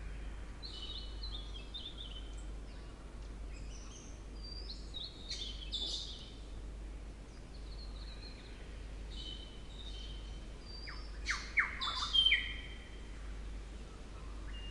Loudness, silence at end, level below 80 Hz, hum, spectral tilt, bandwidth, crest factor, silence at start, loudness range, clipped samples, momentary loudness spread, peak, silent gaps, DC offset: -40 LUFS; 0 s; -46 dBFS; none; -2.5 dB/octave; 11.5 kHz; 24 dB; 0 s; 14 LU; under 0.1%; 17 LU; -18 dBFS; none; under 0.1%